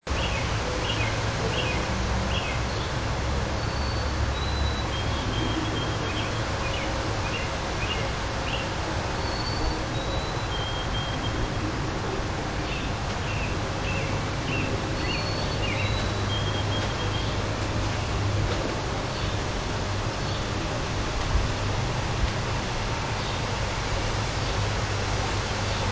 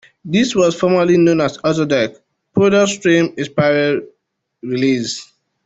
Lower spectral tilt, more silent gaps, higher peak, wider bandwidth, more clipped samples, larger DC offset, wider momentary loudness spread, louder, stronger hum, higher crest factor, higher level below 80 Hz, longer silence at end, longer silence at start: about the same, -4.5 dB/octave vs -5.5 dB/octave; neither; second, -12 dBFS vs -2 dBFS; about the same, 8 kHz vs 8.2 kHz; neither; first, 0.3% vs under 0.1%; second, 2 LU vs 10 LU; second, -28 LUFS vs -15 LUFS; neither; about the same, 16 dB vs 14 dB; first, -34 dBFS vs -54 dBFS; second, 0 s vs 0.4 s; second, 0 s vs 0.25 s